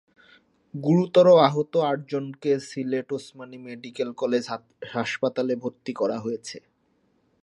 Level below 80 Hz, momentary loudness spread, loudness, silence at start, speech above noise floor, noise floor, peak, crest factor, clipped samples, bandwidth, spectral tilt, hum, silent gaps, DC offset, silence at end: -74 dBFS; 21 LU; -24 LUFS; 0.75 s; 44 dB; -68 dBFS; -2 dBFS; 22 dB; under 0.1%; 11 kHz; -6.5 dB/octave; none; none; under 0.1%; 0.85 s